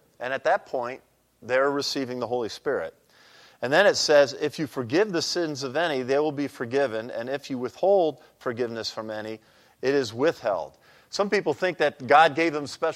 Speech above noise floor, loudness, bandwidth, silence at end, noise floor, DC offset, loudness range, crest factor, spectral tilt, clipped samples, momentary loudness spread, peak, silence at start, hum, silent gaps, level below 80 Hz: 29 dB; -25 LUFS; 14.5 kHz; 0 s; -54 dBFS; under 0.1%; 5 LU; 20 dB; -4 dB/octave; under 0.1%; 14 LU; -4 dBFS; 0.2 s; none; none; -72 dBFS